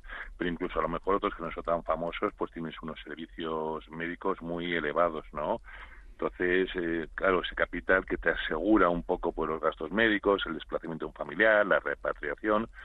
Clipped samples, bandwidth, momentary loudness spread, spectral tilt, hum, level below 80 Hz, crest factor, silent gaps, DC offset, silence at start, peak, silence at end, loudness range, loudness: under 0.1%; 4.7 kHz; 13 LU; -7.5 dB/octave; none; -48 dBFS; 20 dB; none; under 0.1%; 0.05 s; -10 dBFS; 0 s; 6 LU; -30 LUFS